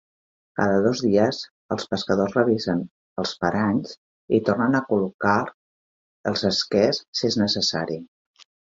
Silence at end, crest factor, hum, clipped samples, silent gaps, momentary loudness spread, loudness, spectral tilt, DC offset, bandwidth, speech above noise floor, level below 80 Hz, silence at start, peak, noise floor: 0.6 s; 18 dB; none; under 0.1%; 1.51-1.69 s, 2.90-3.16 s, 3.97-4.28 s, 5.14-5.19 s, 5.54-6.24 s, 7.08-7.13 s; 11 LU; -23 LUFS; -5 dB/octave; under 0.1%; 7.8 kHz; over 68 dB; -56 dBFS; 0.55 s; -4 dBFS; under -90 dBFS